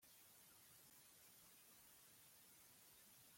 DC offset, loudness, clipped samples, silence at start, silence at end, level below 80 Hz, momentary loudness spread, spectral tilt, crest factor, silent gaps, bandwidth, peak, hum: under 0.1%; -66 LUFS; under 0.1%; 0 s; 0 s; under -90 dBFS; 0 LU; -1 dB/octave; 14 dB; none; 16.5 kHz; -54 dBFS; none